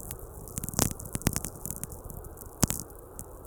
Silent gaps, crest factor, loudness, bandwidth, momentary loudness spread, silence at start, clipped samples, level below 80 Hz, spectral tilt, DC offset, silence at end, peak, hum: none; 34 dB; -32 LUFS; over 20 kHz; 15 LU; 0 s; under 0.1%; -44 dBFS; -3.5 dB/octave; under 0.1%; 0 s; 0 dBFS; none